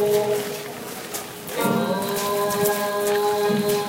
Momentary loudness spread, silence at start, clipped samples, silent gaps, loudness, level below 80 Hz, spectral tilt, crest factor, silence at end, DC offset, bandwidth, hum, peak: 10 LU; 0 s; under 0.1%; none; -23 LUFS; -60 dBFS; -4 dB/octave; 16 dB; 0 s; under 0.1%; 16.5 kHz; none; -6 dBFS